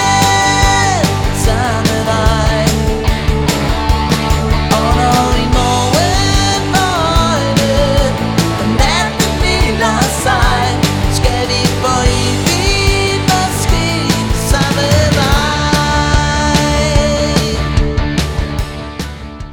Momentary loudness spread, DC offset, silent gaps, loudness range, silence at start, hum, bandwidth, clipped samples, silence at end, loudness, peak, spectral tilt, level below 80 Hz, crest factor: 4 LU; under 0.1%; none; 1 LU; 0 s; none; over 20 kHz; under 0.1%; 0 s; -12 LUFS; 0 dBFS; -4.5 dB/octave; -18 dBFS; 12 dB